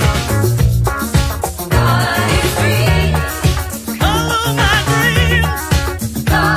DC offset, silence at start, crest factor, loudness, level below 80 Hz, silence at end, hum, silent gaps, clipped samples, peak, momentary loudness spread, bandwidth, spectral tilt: under 0.1%; 0 s; 14 dB; -14 LUFS; -20 dBFS; 0 s; none; none; under 0.1%; 0 dBFS; 5 LU; 16 kHz; -4.5 dB/octave